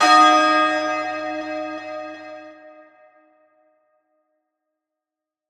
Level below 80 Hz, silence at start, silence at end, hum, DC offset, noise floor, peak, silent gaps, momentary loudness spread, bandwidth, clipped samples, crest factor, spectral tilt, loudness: -82 dBFS; 0 s; 2.8 s; none; under 0.1%; -87 dBFS; -2 dBFS; none; 24 LU; 13.5 kHz; under 0.1%; 20 dB; -1.5 dB/octave; -18 LUFS